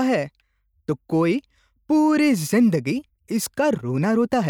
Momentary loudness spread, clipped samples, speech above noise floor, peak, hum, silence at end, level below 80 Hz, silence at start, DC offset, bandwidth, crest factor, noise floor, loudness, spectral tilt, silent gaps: 11 LU; under 0.1%; 28 dB; -10 dBFS; none; 0 s; -62 dBFS; 0 s; under 0.1%; 19.5 kHz; 12 dB; -49 dBFS; -21 LUFS; -6 dB/octave; none